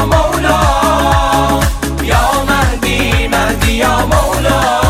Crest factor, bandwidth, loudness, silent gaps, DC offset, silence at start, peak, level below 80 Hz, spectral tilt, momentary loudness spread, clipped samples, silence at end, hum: 12 dB; 17.5 kHz; -12 LUFS; none; under 0.1%; 0 s; 0 dBFS; -18 dBFS; -4.5 dB/octave; 3 LU; under 0.1%; 0 s; none